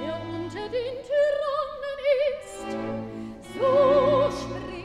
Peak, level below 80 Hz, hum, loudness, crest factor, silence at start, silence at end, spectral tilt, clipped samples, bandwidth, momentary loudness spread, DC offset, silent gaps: -10 dBFS; -52 dBFS; none; -25 LUFS; 16 dB; 0 s; 0 s; -6 dB/octave; under 0.1%; 11.5 kHz; 15 LU; under 0.1%; none